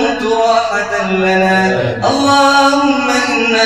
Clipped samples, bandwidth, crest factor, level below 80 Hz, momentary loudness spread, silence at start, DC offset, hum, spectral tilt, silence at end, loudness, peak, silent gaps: under 0.1%; 15 kHz; 12 dB; -44 dBFS; 6 LU; 0 s; under 0.1%; none; -4 dB/octave; 0 s; -12 LUFS; 0 dBFS; none